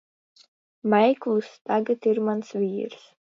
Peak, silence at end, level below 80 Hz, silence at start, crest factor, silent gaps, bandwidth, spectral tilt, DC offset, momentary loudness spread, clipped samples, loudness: -8 dBFS; 0.3 s; -76 dBFS; 0.85 s; 18 dB; 1.61-1.65 s; 7.2 kHz; -7 dB/octave; under 0.1%; 11 LU; under 0.1%; -24 LUFS